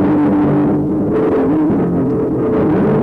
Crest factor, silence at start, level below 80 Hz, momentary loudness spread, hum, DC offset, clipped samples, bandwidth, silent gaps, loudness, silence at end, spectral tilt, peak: 8 dB; 0 s; -38 dBFS; 3 LU; none; under 0.1%; under 0.1%; 4.1 kHz; none; -14 LUFS; 0 s; -11 dB/octave; -6 dBFS